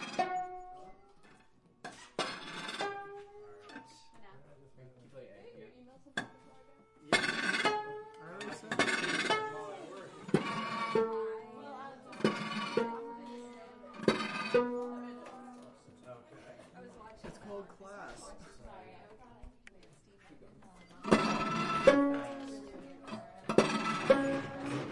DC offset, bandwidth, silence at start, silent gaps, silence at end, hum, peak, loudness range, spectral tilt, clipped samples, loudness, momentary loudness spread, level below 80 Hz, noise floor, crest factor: under 0.1%; 11.5 kHz; 0 s; none; 0 s; none; -8 dBFS; 19 LU; -4.5 dB/octave; under 0.1%; -34 LUFS; 24 LU; -66 dBFS; -64 dBFS; 30 dB